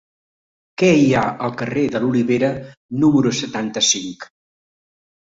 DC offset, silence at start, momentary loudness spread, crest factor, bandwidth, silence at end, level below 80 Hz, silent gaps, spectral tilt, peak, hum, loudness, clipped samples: under 0.1%; 0.8 s; 15 LU; 18 dB; 7.8 kHz; 1 s; -54 dBFS; 2.77-2.89 s; -4.5 dB/octave; -2 dBFS; none; -18 LUFS; under 0.1%